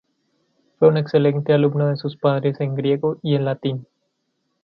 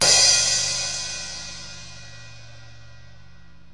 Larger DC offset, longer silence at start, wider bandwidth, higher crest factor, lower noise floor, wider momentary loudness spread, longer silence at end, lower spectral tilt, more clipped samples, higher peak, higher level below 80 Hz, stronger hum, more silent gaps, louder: second, under 0.1% vs 0.8%; first, 0.8 s vs 0 s; second, 5.8 kHz vs 11.5 kHz; about the same, 18 dB vs 20 dB; first, -72 dBFS vs -50 dBFS; second, 6 LU vs 27 LU; second, 0.8 s vs 1.05 s; first, -10.5 dB/octave vs 0.5 dB/octave; neither; about the same, -2 dBFS vs -4 dBFS; second, -66 dBFS vs -50 dBFS; neither; neither; about the same, -20 LUFS vs -18 LUFS